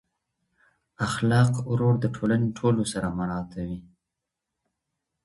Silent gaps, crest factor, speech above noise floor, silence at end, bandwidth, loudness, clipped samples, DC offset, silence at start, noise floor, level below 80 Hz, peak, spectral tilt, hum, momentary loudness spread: none; 20 dB; 61 dB; 1.45 s; 11.5 kHz; -25 LUFS; under 0.1%; under 0.1%; 1 s; -85 dBFS; -52 dBFS; -8 dBFS; -6.5 dB/octave; none; 12 LU